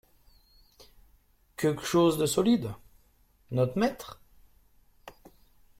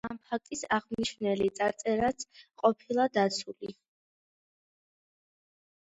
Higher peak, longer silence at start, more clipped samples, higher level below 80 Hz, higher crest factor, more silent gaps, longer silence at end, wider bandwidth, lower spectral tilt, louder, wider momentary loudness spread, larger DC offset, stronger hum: about the same, -12 dBFS vs -10 dBFS; first, 1.6 s vs 0.05 s; neither; about the same, -60 dBFS vs -64 dBFS; about the same, 18 dB vs 22 dB; neither; second, 0.7 s vs 2.2 s; first, 16.5 kHz vs 8.8 kHz; first, -5.5 dB/octave vs -4 dB/octave; first, -27 LUFS vs -30 LUFS; first, 21 LU vs 14 LU; neither; neither